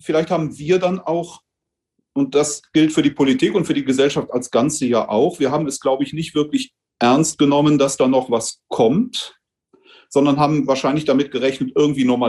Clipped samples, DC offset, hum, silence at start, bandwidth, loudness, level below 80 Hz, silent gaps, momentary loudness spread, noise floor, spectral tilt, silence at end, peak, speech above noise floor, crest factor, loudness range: under 0.1%; under 0.1%; none; 0.05 s; 12.5 kHz; -18 LUFS; -58 dBFS; none; 7 LU; -81 dBFS; -5 dB/octave; 0 s; -4 dBFS; 64 dB; 14 dB; 2 LU